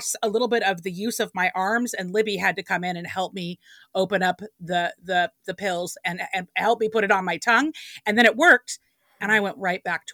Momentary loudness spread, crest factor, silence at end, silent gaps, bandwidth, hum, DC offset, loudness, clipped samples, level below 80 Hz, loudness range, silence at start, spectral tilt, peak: 12 LU; 20 dB; 0 s; none; 19.5 kHz; none; under 0.1%; -23 LUFS; under 0.1%; -72 dBFS; 6 LU; 0 s; -3.5 dB/octave; -4 dBFS